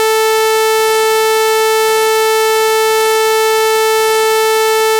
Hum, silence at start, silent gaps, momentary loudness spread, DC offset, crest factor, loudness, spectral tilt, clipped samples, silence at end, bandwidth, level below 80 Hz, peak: none; 0 s; none; 0 LU; under 0.1%; 8 dB; -11 LUFS; 1 dB/octave; under 0.1%; 0 s; 17 kHz; -58 dBFS; -4 dBFS